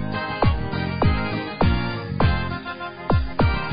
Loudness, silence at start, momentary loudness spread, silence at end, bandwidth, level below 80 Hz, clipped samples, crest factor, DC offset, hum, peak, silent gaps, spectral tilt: -23 LUFS; 0 s; 7 LU; 0 s; 5.2 kHz; -28 dBFS; under 0.1%; 16 dB; 0.6%; none; -6 dBFS; none; -11.5 dB/octave